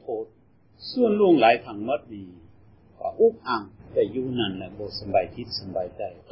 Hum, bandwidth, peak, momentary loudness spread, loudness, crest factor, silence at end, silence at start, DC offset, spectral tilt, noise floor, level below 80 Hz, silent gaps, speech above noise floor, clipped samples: none; 5.8 kHz; -6 dBFS; 16 LU; -25 LUFS; 20 dB; 0.15 s; 0.05 s; under 0.1%; -9.5 dB/octave; -58 dBFS; -56 dBFS; none; 34 dB; under 0.1%